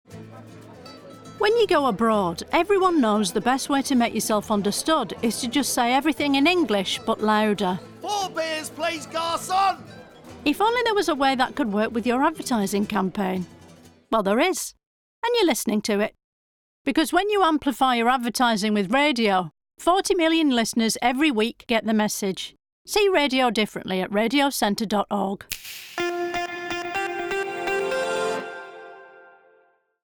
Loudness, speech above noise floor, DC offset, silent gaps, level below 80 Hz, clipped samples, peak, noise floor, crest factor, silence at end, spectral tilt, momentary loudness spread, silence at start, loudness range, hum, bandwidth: -23 LUFS; 40 dB; under 0.1%; 14.86-15.22 s, 16.24-16.85 s, 22.72-22.85 s; -56 dBFS; under 0.1%; -8 dBFS; -62 dBFS; 16 dB; 0.95 s; -3.5 dB/octave; 10 LU; 0.1 s; 5 LU; none; over 20 kHz